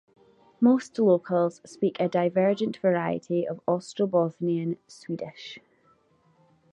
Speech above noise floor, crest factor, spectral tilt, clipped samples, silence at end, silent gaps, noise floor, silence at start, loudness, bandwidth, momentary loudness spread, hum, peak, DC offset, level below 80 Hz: 38 dB; 18 dB; -7.5 dB/octave; under 0.1%; 1.15 s; none; -64 dBFS; 0.6 s; -26 LUFS; 10 kHz; 14 LU; none; -10 dBFS; under 0.1%; -74 dBFS